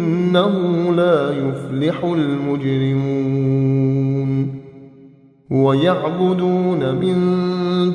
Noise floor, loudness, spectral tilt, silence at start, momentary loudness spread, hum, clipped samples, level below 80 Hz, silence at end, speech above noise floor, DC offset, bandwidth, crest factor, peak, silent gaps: -46 dBFS; -18 LUFS; -9 dB/octave; 0 s; 5 LU; none; under 0.1%; -56 dBFS; 0 s; 29 dB; under 0.1%; 10 kHz; 14 dB; -2 dBFS; none